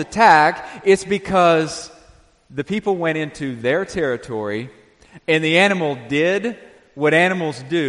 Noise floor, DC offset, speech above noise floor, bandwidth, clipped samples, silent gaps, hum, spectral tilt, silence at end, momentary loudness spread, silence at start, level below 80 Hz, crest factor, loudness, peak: -51 dBFS; under 0.1%; 33 dB; 11.5 kHz; under 0.1%; none; none; -5 dB/octave; 0 s; 15 LU; 0 s; -52 dBFS; 18 dB; -18 LUFS; 0 dBFS